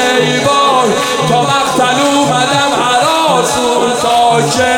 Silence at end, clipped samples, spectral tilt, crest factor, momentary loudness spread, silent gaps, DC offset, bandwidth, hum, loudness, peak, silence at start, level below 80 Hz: 0 s; under 0.1%; -3 dB/octave; 10 dB; 2 LU; none; under 0.1%; 17 kHz; none; -10 LUFS; 0 dBFS; 0 s; -48 dBFS